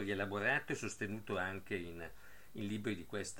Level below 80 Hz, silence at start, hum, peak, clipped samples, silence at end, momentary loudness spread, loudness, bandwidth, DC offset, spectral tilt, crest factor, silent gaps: -66 dBFS; 0 s; none; -22 dBFS; under 0.1%; 0 s; 16 LU; -40 LUFS; 17 kHz; 0.2%; -4.5 dB/octave; 18 dB; none